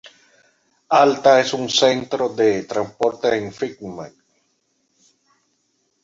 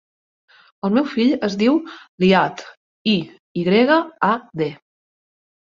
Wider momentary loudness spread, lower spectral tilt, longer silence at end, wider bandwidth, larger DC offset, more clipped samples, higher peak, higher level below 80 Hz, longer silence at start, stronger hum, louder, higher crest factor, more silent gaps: first, 17 LU vs 11 LU; second, -3.5 dB/octave vs -6.5 dB/octave; first, 1.95 s vs 0.95 s; about the same, 7.8 kHz vs 7.4 kHz; neither; neither; about the same, -2 dBFS vs -2 dBFS; about the same, -62 dBFS vs -60 dBFS; about the same, 0.9 s vs 0.85 s; neither; about the same, -18 LUFS vs -19 LUFS; about the same, 20 dB vs 18 dB; second, none vs 2.09-2.18 s, 2.77-3.05 s, 3.40-3.55 s